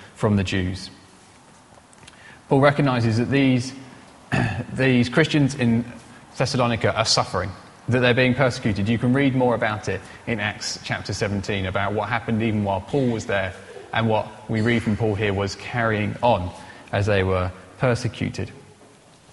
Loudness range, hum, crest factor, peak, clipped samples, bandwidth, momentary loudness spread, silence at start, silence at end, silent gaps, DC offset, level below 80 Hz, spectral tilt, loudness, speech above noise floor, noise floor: 4 LU; none; 22 dB; -2 dBFS; under 0.1%; 11.5 kHz; 11 LU; 0 s; 0.7 s; none; under 0.1%; -50 dBFS; -5.5 dB/octave; -22 LUFS; 29 dB; -50 dBFS